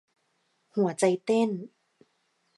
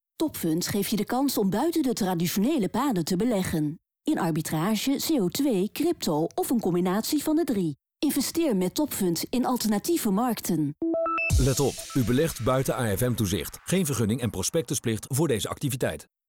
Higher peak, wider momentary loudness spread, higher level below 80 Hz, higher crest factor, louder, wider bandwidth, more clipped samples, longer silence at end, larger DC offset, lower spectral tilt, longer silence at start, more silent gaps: first, -10 dBFS vs -14 dBFS; first, 13 LU vs 4 LU; second, -82 dBFS vs -44 dBFS; first, 20 dB vs 10 dB; about the same, -27 LUFS vs -26 LUFS; second, 11.5 kHz vs over 20 kHz; neither; first, 0.9 s vs 0.25 s; neither; about the same, -5.5 dB/octave vs -5 dB/octave; first, 0.75 s vs 0.2 s; neither